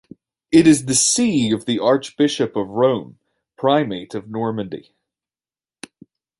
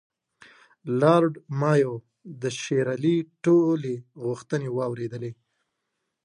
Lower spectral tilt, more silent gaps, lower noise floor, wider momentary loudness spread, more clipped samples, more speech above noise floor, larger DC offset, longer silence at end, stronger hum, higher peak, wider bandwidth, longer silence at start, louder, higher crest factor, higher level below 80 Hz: second, -4 dB/octave vs -7 dB/octave; neither; first, under -90 dBFS vs -80 dBFS; about the same, 14 LU vs 14 LU; neither; first, over 72 dB vs 56 dB; neither; first, 1.6 s vs 0.9 s; neither; first, -2 dBFS vs -6 dBFS; about the same, 11.5 kHz vs 10.5 kHz; second, 0.5 s vs 0.85 s; first, -18 LUFS vs -25 LUFS; about the same, 18 dB vs 20 dB; first, -56 dBFS vs -72 dBFS